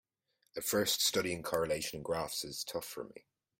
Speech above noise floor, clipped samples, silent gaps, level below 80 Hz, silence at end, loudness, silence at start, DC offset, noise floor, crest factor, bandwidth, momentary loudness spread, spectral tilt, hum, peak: 43 dB; under 0.1%; none; -66 dBFS; 0.4 s; -35 LUFS; 0.55 s; under 0.1%; -79 dBFS; 20 dB; 16.5 kHz; 15 LU; -2.5 dB/octave; none; -18 dBFS